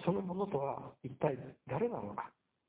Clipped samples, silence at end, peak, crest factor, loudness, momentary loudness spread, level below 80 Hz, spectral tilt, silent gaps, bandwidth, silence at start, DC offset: under 0.1%; 0.4 s; -20 dBFS; 20 dB; -39 LUFS; 9 LU; -70 dBFS; -7.5 dB/octave; none; 4 kHz; 0 s; under 0.1%